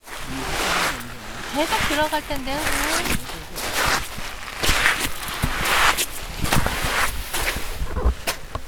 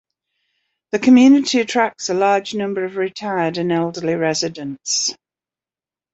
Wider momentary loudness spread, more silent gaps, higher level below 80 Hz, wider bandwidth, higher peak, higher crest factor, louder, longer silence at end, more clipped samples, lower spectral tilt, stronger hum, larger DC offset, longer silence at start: about the same, 11 LU vs 12 LU; neither; first, -32 dBFS vs -64 dBFS; first, over 20 kHz vs 8 kHz; about the same, 0 dBFS vs -2 dBFS; first, 22 dB vs 16 dB; second, -23 LUFS vs -17 LUFS; second, 0 s vs 1 s; neither; second, -2.5 dB/octave vs -4 dB/octave; neither; neither; second, 0.05 s vs 0.95 s